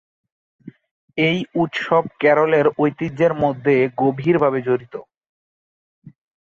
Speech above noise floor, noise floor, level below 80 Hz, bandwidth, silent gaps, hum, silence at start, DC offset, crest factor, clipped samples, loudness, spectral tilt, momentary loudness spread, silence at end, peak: over 72 dB; under -90 dBFS; -60 dBFS; 7.2 kHz; 0.91-1.08 s, 5.17-5.21 s, 5.29-6.02 s; none; 0.65 s; under 0.1%; 18 dB; under 0.1%; -18 LUFS; -7.5 dB/octave; 7 LU; 0.5 s; -4 dBFS